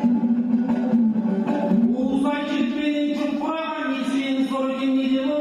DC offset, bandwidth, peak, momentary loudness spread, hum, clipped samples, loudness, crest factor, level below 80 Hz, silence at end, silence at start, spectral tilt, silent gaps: under 0.1%; 10.5 kHz; -10 dBFS; 4 LU; none; under 0.1%; -22 LUFS; 12 dB; -60 dBFS; 0 s; 0 s; -7 dB/octave; none